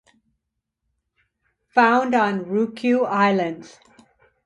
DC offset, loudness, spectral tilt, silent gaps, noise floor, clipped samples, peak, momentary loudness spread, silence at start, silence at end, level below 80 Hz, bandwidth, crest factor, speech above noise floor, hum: under 0.1%; -20 LUFS; -6.5 dB/octave; none; -79 dBFS; under 0.1%; -4 dBFS; 7 LU; 1.75 s; 0.8 s; -68 dBFS; 11 kHz; 20 dB; 60 dB; none